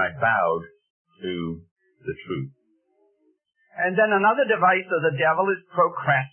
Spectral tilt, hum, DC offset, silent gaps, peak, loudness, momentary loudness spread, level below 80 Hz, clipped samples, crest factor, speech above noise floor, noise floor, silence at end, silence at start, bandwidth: -10 dB/octave; none; under 0.1%; 0.90-1.05 s, 1.71-1.76 s; -8 dBFS; -22 LUFS; 17 LU; -64 dBFS; under 0.1%; 16 dB; 45 dB; -67 dBFS; 0.05 s; 0 s; 3.4 kHz